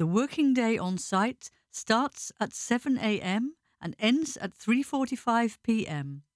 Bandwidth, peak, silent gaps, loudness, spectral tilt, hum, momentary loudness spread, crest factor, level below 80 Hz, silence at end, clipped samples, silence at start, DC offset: 11 kHz; -12 dBFS; none; -29 LUFS; -4.5 dB/octave; none; 11 LU; 18 dB; -68 dBFS; 0.15 s; under 0.1%; 0 s; under 0.1%